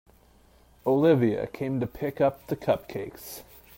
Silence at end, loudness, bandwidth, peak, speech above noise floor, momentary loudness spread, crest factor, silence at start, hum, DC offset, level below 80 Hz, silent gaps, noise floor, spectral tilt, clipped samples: 0.35 s; -27 LUFS; 16.5 kHz; -8 dBFS; 32 dB; 17 LU; 18 dB; 0.85 s; none; under 0.1%; -56 dBFS; none; -58 dBFS; -7.5 dB/octave; under 0.1%